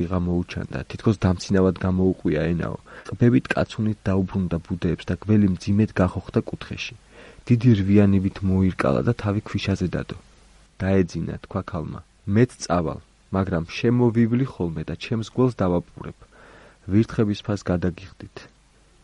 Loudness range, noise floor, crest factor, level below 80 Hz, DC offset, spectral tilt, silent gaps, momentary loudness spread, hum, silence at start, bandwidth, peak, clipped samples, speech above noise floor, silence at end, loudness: 4 LU; -56 dBFS; 18 dB; -46 dBFS; under 0.1%; -7.5 dB/octave; none; 14 LU; none; 0 s; 11 kHz; -4 dBFS; under 0.1%; 34 dB; 0.55 s; -23 LUFS